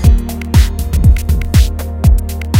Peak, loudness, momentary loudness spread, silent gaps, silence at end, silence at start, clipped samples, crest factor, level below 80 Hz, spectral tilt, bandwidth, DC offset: 0 dBFS; -13 LUFS; 5 LU; none; 0 s; 0 s; 0.7%; 10 dB; -12 dBFS; -6 dB/octave; 16.5 kHz; under 0.1%